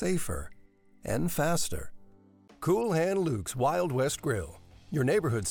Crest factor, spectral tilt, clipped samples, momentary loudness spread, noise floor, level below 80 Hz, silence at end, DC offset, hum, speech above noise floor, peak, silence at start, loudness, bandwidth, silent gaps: 14 dB; -5.5 dB/octave; under 0.1%; 13 LU; -58 dBFS; -52 dBFS; 0 s; under 0.1%; none; 29 dB; -16 dBFS; 0 s; -30 LUFS; 19 kHz; none